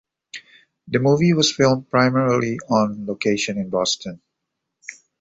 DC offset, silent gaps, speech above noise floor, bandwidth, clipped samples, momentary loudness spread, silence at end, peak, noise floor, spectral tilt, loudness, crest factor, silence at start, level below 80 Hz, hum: under 0.1%; none; 60 dB; 8.2 kHz; under 0.1%; 22 LU; 0.3 s; -2 dBFS; -79 dBFS; -5 dB/octave; -19 LUFS; 18 dB; 0.35 s; -56 dBFS; none